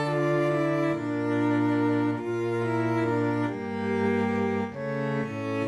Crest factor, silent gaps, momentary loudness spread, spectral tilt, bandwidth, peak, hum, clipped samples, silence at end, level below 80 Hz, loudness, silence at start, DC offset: 12 dB; none; 6 LU; -8 dB/octave; 11 kHz; -14 dBFS; none; under 0.1%; 0 s; -66 dBFS; -27 LUFS; 0 s; under 0.1%